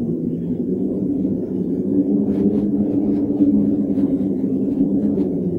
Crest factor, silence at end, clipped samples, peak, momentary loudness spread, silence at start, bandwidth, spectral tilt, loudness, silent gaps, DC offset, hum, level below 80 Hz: 14 dB; 0 s; under 0.1%; -4 dBFS; 5 LU; 0 s; 2.4 kHz; -12 dB/octave; -19 LUFS; none; under 0.1%; none; -46 dBFS